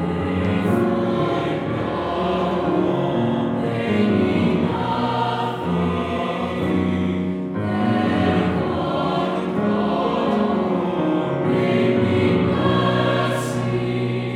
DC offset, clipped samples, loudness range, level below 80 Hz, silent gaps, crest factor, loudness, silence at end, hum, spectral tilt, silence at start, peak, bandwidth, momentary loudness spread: under 0.1%; under 0.1%; 2 LU; -46 dBFS; none; 14 dB; -21 LUFS; 0 s; none; -7.5 dB/octave; 0 s; -6 dBFS; 13 kHz; 5 LU